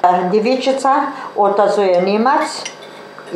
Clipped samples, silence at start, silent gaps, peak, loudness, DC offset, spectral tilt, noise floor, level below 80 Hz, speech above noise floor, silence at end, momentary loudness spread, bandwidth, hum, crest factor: under 0.1%; 0.05 s; none; 0 dBFS; -15 LUFS; under 0.1%; -5 dB/octave; -34 dBFS; -74 dBFS; 20 dB; 0 s; 16 LU; 12.5 kHz; none; 14 dB